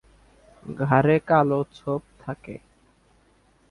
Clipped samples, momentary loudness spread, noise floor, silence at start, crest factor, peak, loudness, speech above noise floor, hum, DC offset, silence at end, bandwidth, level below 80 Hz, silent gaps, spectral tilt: under 0.1%; 22 LU; -61 dBFS; 0.65 s; 22 dB; -4 dBFS; -22 LUFS; 38 dB; none; under 0.1%; 1.1 s; 11 kHz; -56 dBFS; none; -9 dB/octave